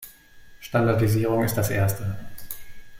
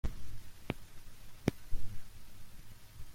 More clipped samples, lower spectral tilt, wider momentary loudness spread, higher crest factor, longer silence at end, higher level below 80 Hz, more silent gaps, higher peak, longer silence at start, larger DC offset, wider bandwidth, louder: neither; about the same, -6.5 dB/octave vs -6 dB/octave; about the same, 18 LU vs 18 LU; second, 16 dB vs 22 dB; about the same, 0 s vs 0 s; about the same, -48 dBFS vs -46 dBFS; neither; first, -8 dBFS vs -12 dBFS; about the same, 0 s vs 0.05 s; neither; about the same, 16.5 kHz vs 16 kHz; first, -23 LUFS vs -44 LUFS